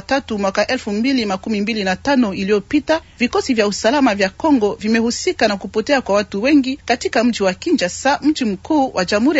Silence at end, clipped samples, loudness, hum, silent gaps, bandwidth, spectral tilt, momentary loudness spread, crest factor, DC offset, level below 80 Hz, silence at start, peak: 0 s; under 0.1%; -17 LUFS; none; none; 8 kHz; -4.5 dB/octave; 5 LU; 14 dB; under 0.1%; -48 dBFS; 0.1 s; -2 dBFS